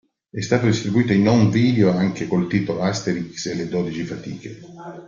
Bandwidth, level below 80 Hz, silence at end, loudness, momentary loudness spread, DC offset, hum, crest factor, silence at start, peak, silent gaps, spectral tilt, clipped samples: 7.6 kHz; -52 dBFS; 0 s; -20 LUFS; 18 LU; under 0.1%; none; 18 dB; 0.35 s; -4 dBFS; none; -6.5 dB/octave; under 0.1%